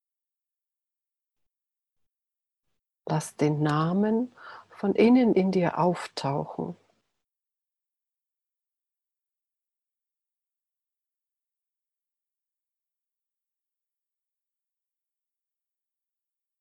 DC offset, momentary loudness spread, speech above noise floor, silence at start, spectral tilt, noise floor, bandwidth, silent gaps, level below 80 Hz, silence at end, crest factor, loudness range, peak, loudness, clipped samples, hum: under 0.1%; 16 LU; 65 dB; 3.05 s; -7 dB/octave; -89 dBFS; 12.5 kHz; none; -72 dBFS; 9.9 s; 22 dB; 14 LU; -10 dBFS; -25 LUFS; under 0.1%; none